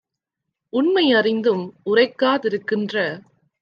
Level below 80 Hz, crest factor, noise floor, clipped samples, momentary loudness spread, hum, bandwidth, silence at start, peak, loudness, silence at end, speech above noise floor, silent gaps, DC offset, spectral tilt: -74 dBFS; 16 dB; -82 dBFS; under 0.1%; 9 LU; none; 6.8 kHz; 0.75 s; -4 dBFS; -20 LUFS; 0.4 s; 62 dB; none; under 0.1%; -6.5 dB/octave